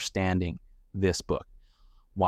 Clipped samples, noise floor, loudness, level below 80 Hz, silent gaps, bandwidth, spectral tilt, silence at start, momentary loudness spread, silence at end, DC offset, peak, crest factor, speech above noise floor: under 0.1%; -59 dBFS; -30 LUFS; -48 dBFS; none; 14.5 kHz; -5.5 dB/octave; 0 s; 15 LU; 0 s; under 0.1%; -12 dBFS; 18 dB; 30 dB